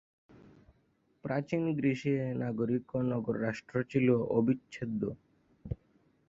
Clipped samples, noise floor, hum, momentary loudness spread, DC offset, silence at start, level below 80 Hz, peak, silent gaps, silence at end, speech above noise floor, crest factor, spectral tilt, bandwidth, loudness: under 0.1%; -72 dBFS; none; 16 LU; under 0.1%; 1.25 s; -60 dBFS; -14 dBFS; none; 0.55 s; 40 dB; 18 dB; -8.5 dB/octave; 7.8 kHz; -32 LUFS